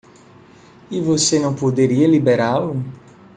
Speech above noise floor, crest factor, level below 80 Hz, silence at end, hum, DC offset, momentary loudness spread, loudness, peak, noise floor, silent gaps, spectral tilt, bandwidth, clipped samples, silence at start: 29 dB; 16 dB; -58 dBFS; 0.4 s; none; under 0.1%; 13 LU; -17 LUFS; -4 dBFS; -46 dBFS; none; -5 dB/octave; 9.6 kHz; under 0.1%; 0.9 s